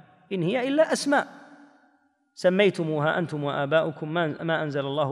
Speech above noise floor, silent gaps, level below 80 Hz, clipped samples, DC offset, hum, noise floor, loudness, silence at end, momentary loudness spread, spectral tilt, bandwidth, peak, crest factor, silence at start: 41 dB; none; -76 dBFS; under 0.1%; under 0.1%; none; -66 dBFS; -25 LUFS; 0 s; 7 LU; -5.5 dB/octave; 13.5 kHz; -8 dBFS; 18 dB; 0.3 s